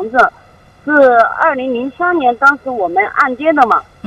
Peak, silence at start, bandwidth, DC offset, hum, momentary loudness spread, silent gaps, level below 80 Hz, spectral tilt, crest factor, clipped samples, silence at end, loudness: 0 dBFS; 0 s; 10.5 kHz; under 0.1%; none; 8 LU; none; -50 dBFS; -5.5 dB/octave; 12 dB; 0.1%; 0.25 s; -12 LUFS